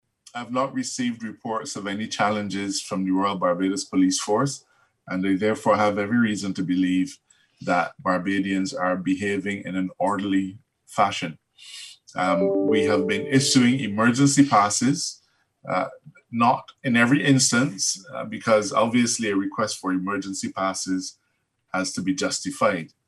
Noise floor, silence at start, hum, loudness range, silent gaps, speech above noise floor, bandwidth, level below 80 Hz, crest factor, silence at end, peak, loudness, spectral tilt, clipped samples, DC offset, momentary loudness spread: -71 dBFS; 0.35 s; none; 6 LU; none; 49 dB; 12.5 kHz; -68 dBFS; 18 dB; 0.2 s; -4 dBFS; -23 LUFS; -4 dB/octave; under 0.1%; under 0.1%; 12 LU